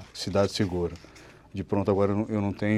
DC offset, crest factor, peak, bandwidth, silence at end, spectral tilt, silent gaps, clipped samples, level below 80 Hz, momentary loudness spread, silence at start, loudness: under 0.1%; 18 dB; -10 dBFS; 13 kHz; 0 s; -6.5 dB/octave; none; under 0.1%; -56 dBFS; 13 LU; 0 s; -27 LUFS